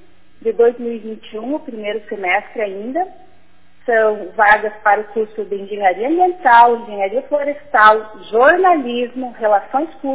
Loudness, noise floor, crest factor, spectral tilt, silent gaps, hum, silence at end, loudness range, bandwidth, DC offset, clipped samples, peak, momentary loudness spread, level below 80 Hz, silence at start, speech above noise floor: -16 LUFS; -53 dBFS; 16 dB; -7.5 dB/octave; none; none; 0 s; 7 LU; 4 kHz; 1%; under 0.1%; 0 dBFS; 14 LU; -56 dBFS; 0.45 s; 38 dB